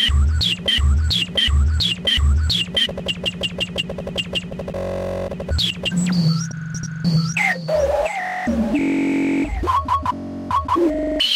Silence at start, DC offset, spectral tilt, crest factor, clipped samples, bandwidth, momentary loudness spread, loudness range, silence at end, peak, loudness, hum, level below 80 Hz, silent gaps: 0 s; under 0.1%; -5 dB/octave; 12 dB; under 0.1%; 14.5 kHz; 8 LU; 4 LU; 0 s; -8 dBFS; -20 LUFS; none; -26 dBFS; none